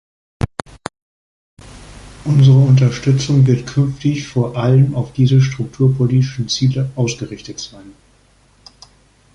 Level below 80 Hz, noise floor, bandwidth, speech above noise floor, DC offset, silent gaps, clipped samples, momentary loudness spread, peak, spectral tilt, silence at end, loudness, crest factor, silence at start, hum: -42 dBFS; -52 dBFS; 10.5 kHz; 38 dB; under 0.1%; 1.02-1.57 s; under 0.1%; 18 LU; -2 dBFS; -7 dB/octave; 1.45 s; -15 LUFS; 14 dB; 0.4 s; none